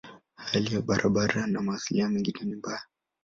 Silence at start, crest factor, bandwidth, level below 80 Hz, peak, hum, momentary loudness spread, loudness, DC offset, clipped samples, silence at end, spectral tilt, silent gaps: 0.05 s; 20 dB; 7.6 kHz; -58 dBFS; -10 dBFS; none; 11 LU; -28 LUFS; under 0.1%; under 0.1%; 0.4 s; -5 dB/octave; none